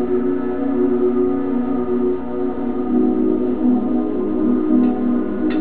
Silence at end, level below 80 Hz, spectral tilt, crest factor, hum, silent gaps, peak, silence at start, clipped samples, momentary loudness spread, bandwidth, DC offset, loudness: 0 s; -42 dBFS; -12 dB/octave; 12 dB; none; none; -4 dBFS; 0 s; under 0.1%; 5 LU; 4 kHz; 4%; -19 LUFS